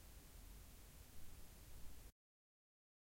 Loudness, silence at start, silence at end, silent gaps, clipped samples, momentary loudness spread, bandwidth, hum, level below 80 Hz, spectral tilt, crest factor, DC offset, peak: -62 LUFS; 0 s; 0.9 s; none; under 0.1%; 1 LU; 16.5 kHz; none; -62 dBFS; -3.5 dB/octave; 16 dB; under 0.1%; -42 dBFS